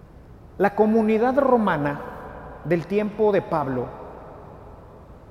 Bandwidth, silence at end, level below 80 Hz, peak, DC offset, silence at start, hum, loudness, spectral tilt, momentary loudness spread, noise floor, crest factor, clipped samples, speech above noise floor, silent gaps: 12.5 kHz; 0.1 s; -48 dBFS; -6 dBFS; under 0.1%; 0.3 s; none; -22 LUFS; -8.5 dB/octave; 21 LU; -45 dBFS; 18 dB; under 0.1%; 24 dB; none